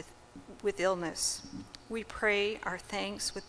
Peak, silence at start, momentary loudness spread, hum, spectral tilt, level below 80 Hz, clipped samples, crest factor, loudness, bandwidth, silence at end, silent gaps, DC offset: -16 dBFS; 0 s; 17 LU; none; -2.5 dB/octave; -58 dBFS; under 0.1%; 18 dB; -33 LUFS; 11 kHz; 0 s; none; under 0.1%